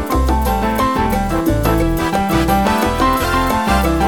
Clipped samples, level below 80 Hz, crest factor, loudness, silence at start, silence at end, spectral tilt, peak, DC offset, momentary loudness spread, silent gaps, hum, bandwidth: under 0.1%; -22 dBFS; 14 dB; -16 LUFS; 0 s; 0 s; -5.5 dB/octave; 0 dBFS; 0.7%; 2 LU; none; none; 18 kHz